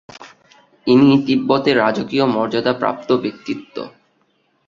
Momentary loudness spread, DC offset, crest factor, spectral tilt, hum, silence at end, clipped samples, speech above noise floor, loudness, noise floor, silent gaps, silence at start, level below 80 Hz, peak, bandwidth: 15 LU; under 0.1%; 16 dB; -7 dB/octave; none; 0.8 s; under 0.1%; 46 dB; -17 LUFS; -63 dBFS; none; 0.2 s; -58 dBFS; -2 dBFS; 7.4 kHz